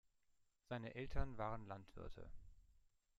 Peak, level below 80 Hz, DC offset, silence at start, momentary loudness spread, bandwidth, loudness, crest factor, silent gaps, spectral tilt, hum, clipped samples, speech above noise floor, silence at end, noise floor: -26 dBFS; -54 dBFS; under 0.1%; 0.7 s; 15 LU; 7.2 kHz; -51 LUFS; 24 dB; none; -7.5 dB/octave; none; under 0.1%; 33 dB; 0.6 s; -79 dBFS